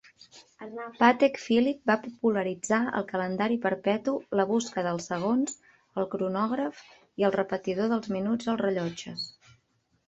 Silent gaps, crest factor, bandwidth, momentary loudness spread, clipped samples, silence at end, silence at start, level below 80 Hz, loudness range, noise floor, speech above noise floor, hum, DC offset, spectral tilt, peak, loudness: none; 22 dB; 8.2 kHz; 12 LU; under 0.1%; 0.8 s; 0.35 s; -70 dBFS; 4 LU; -71 dBFS; 44 dB; none; under 0.1%; -5 dB/octave; -6 dBFS; -28 LUFS